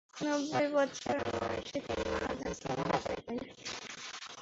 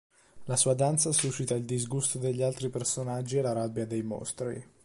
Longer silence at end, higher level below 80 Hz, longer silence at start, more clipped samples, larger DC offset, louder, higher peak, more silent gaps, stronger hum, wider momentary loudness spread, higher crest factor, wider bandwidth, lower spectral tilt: second, 0 s vs 0.2 s; first, -56 dBFS vs -64 dBFS; second, 0.15 s vs 0.35 s; neither; neither; second, -36 LUFS vs -29 LUFS; second, -18 dBFS vs -10 dBFS; neither; neither; about the same, 11 LU vs 10 LU; about the same, 18 dB vs 20 dB; second, 8 kHz vs 11.5 kHz; about the same, -3.5 dB/octave vs -4.5 dB/octave